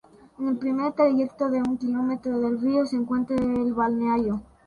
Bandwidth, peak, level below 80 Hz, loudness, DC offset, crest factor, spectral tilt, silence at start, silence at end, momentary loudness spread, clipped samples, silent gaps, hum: 6.8 kHz; -8 dBFS; -56 dBFS; -25 LUFS; under 0.1%; 16 dB; -7.5 dB/octave; 0.4 s; 0.25 s; 5 LU; under 0.1%; none; none